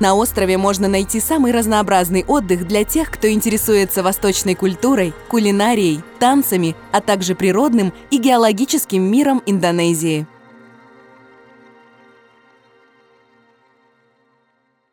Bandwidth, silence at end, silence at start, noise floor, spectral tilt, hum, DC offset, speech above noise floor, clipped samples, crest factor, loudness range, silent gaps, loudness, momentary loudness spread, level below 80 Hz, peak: over 20 kHz; 4.65 s; 0 s; -63 dBFS; -4.5 dB/octave; none; under 0.1%; 48 dB; under 0.1%; 16 dB; 4 LU; none; -16 LUFS; 4 LU; -42 dBFS; -2 dBFS